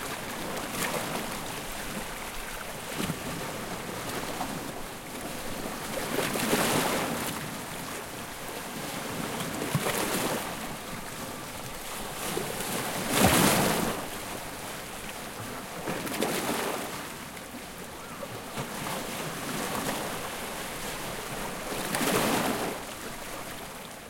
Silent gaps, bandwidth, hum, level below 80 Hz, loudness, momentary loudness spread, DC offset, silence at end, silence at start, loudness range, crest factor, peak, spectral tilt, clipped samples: none; 17 kHz; none; -50 dBFS; -31 LUFS; 12 LU; under 0.1%; 0 s; 0 s; 7 LU; 24 dB; -8 dBFS; -3 dB/octave; under 0.1%